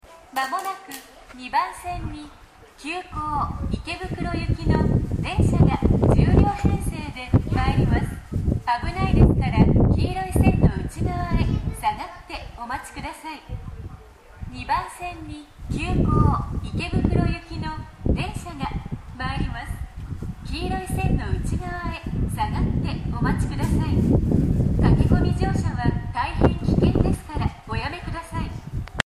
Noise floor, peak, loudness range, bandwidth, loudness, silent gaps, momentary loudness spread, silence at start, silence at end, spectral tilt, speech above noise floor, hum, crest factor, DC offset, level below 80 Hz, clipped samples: -44 dBFS; -2 dBFS; 9 LU; 15.5 kHz; -23 LUFS; none; 16 LU; 0.1 s; 0.05 s; -7.5 dB/octave; 22 dB; none; 22 dB; under 0.1%; -28 dBFS; under 0.1%